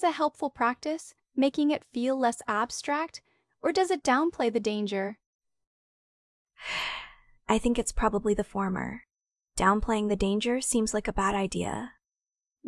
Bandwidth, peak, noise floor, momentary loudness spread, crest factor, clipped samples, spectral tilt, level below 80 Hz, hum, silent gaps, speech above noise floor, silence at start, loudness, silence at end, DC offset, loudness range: 12 kHz; -10 dBFS; under -90 dBFS; 12 LU; 20 dB; under 0.1%; -4 dB/octave; -46 dBFS; none; 5.26-5.39 s, 5.67-6.45 s; over 62 dB; 0 s; -28 LUFS; 0 s; under 0.1%; 4 LU